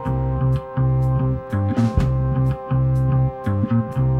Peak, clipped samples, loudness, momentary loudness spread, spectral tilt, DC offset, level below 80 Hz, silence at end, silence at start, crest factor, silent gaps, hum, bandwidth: -6 dBFS; under 0.1%; -20 LUFS; 3 LU; -10 dB/octave; under 0.1%; -30 dBFS; 0 s; 0 s; 14 dB; none; none; 4.6 kHz